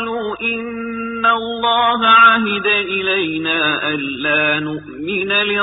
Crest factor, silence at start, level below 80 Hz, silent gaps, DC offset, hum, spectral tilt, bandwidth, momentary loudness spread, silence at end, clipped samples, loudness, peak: 16 dB; 0 s; -54 dBFS; none; under 0.1%; none; -9 dB/octave; 4 kHz; 13 LU; 0 s; under 0.1%; -15 LUFS; 0 dBFS